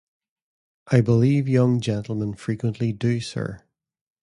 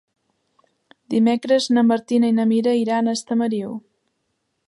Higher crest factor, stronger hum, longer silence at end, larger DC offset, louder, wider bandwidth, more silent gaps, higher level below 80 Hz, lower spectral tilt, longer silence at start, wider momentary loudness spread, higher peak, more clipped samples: about the same, 18 dB vs 14 dB; neither; second, 0.65 s vs 0.9 s; neither; second, -22 LUFS vs -19 LUFS; about the same, 11 kHz vs 11.5 kHz; neither; first, -54 dBFS vs -72 dBFS; first, -7.5 dB/octave vs -5.5 dB/octave; second, 0.85 s vs 1.1 s; about the same, 10 LU vs 8 LU; about the same, -4 dBFS vs -6 dBFS; neither